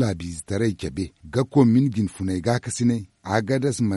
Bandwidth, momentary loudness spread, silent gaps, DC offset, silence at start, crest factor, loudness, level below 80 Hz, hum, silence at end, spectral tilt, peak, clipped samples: 11.5 kHz; 11 LU; none; under 0.1%; 0 s; 16 dB; -23 LUFS; -52 dBFS; none; 0 s; -6.5 dB/octave; -6 dBFS; under 0.1%